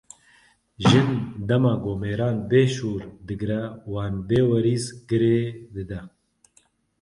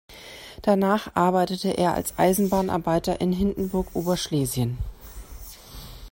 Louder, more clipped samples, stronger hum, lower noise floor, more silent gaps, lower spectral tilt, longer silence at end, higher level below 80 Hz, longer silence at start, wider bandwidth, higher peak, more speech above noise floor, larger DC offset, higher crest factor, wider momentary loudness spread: about the same, -23 LUFS vs -24 LUFS; neither; neither; first, -63 dBFS vs -43 dBFS; neither; first, -7 dB/octave vs -5.5 dB/octave; first, 0.95 s vs 0.05 s; second, -48 dBFS vs -42 dBFS; first, 0.8 s vs 0.1 s; second, 11.5 kHz vs 16.5 kHz; about the same, -4 dBFS vs -6 dBFS; first, 40 dB vs 20 dB; neither; about the same, 20 dB vs 18 dB; second, 14 LU vs 20 LU